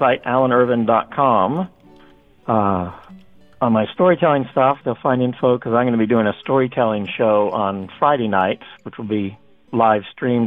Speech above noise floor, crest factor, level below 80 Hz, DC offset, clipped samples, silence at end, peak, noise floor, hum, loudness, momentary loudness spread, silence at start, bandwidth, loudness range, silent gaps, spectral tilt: 32 dB; 16 dB; -56 dBFS; 0.1%; under 0.1%; 0 s; -2 dBFS; -49 dBFS; none; -18 LUFS; 9 LU; 0 s; 4 kHz; 3 LU; none; -9.5 dB/octave